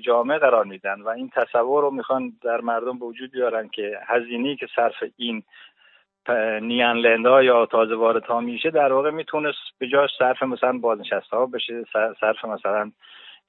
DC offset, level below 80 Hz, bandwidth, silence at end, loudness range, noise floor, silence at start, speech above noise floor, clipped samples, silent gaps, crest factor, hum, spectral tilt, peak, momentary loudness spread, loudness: under 0.1%; -80 dBFS; 4.2 kHz; 0.2 s; 7 LU; -58 dBFS; 0 s; 37 dB; under 0.1%; none; 18 dB; none; -8 dB/octave; -4 dBFS; 11 LU; -22 LUFS